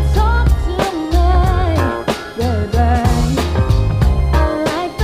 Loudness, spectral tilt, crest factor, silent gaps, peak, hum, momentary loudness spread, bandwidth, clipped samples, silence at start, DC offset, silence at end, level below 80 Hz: -16 LUFS; -6.5 dB/octave; 12 dB; none; 0 dBFS; none; 5 LU; 15 kHz; under 0.1%; 0 s; under 0.1%; 0 s; -16 dBFS